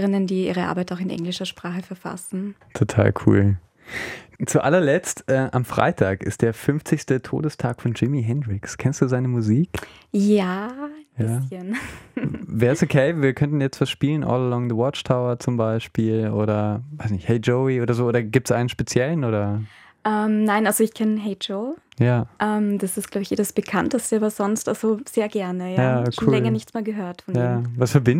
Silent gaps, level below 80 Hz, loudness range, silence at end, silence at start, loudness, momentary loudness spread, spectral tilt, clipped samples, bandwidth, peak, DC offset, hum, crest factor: none; -54 dBFS; 2 LU; 0 s; 0 s; -22 LUFS; 10 LU; -6.5 dB/octave; under 0.1%; 16 kHz; 0 dBFS; under 0.1%; none; 20 dB